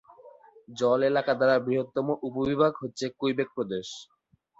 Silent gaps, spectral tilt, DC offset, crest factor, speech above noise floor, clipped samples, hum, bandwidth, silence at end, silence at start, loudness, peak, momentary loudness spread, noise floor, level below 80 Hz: none; -5.5 dB/octave; under 0.1%; 18 dB; 26 dB; under 0.1%; none; 8 kHz; 0.55 s; 0.25 s; -27 LUFS; -10 dBFS; 11 LU; -53 dBFS; -64 dBFS